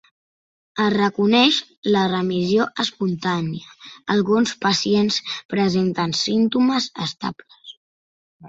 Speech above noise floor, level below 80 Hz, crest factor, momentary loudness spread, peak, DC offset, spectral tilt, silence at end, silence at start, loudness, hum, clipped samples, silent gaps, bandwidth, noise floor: over 70 dB; -60 dBFS; 18 dB; 12 LU; -2 dBFS; under 0.1%; -5 dB/octave; 0 s; 0.75 s; -20 LUFS; none; under 0.1%; 1.77-1.83 s, 5.45-5.49 s, 7.77-8.40 s; 8 kHz; under -90 dBFS